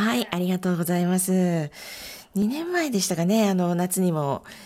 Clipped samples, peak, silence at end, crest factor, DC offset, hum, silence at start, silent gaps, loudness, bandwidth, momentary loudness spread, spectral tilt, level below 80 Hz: under 0.1%; -10 dBFS; 0 s; 14 dB; under 0.1%; none; 0 s; none; -24 LUFS; 16 kHz; 10 LU; -5 dB/octave; -62 dBFS